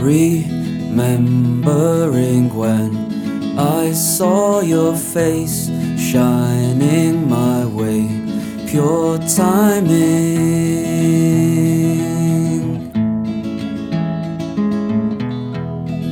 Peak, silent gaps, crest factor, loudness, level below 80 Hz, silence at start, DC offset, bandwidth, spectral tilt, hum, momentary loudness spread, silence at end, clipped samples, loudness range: -2 dBFS; none; 14 dB; -16 LUFS; -46 dBFS; 0 s; under 0.1%; 18.5 kHz; -6.5 dB/octave; none; 8 LU; 0 s; under 0.1%; 4 LU